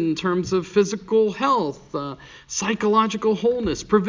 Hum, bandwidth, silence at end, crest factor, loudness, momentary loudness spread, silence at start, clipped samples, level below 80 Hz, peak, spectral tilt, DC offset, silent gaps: none; 7.6 kHz; 0 s; 16 dB; -22 LUFS; 11 LU; 0 s; under 0.1%; -50 dBFS; -4 dBFS; -5 dB/octave; under 0.1%; none